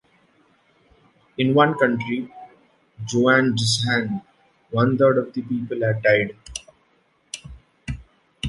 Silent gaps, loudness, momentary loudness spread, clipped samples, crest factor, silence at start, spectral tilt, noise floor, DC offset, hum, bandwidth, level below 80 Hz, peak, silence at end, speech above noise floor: none; -20 LUFS; 19 LU; under 0.1%; 20 dB; 1.4 s; -5 dB/octave; -63 dBFS; under 0.1%; none; 11.5 kHz; -48 dBFS; -4 dBFS; 0 s; 43 dB